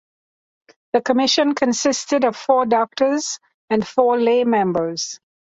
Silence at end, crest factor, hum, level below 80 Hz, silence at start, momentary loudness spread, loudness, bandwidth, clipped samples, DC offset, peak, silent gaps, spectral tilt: 0.4 s; 16 dB; none; -62 dBFS; 0.95 s; 9 LU; -19 LUFS; 8 kHz; under 0.1%; under 0.1%; -2 dBFS; 3.54-3.68 s; -3.5 dB/octave